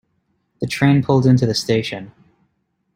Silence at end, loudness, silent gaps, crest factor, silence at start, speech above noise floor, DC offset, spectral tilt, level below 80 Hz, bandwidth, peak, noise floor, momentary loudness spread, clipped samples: 0.85 s; -17 LUFS; none; 16 dB; 0.6 s; 52 dB; under 0.1%; -6.5 dB/octave; -52 dBFS; 15.5 kHz; -2 dBFS; -69 dBFS; 14 LU; under 0.1%